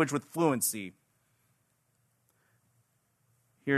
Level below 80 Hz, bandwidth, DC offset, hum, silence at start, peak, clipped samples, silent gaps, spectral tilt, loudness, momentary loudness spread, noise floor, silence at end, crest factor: -80 dBFS; 13.5 kHz; under 0.1%; none; 0 s; -12 dBFS; under 0.1%; none; -4.5 dB/octave; -31 LUFS; 14 LU; -74 dBFS; 0 s; 22 dB